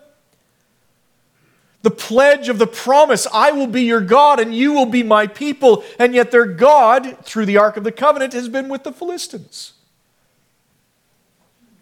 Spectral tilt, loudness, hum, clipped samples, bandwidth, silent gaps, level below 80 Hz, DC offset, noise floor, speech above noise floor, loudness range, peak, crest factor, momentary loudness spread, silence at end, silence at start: -4 dB/octave; -14 LUFS; none; under 0.1%; 17 kHz; none; -64 dBFS; under 0.1%; -62 dBFS; 48 dB; 10 LU; 0 dBFS; 16 dB; 15 LU; 2.15 s; 1.85 s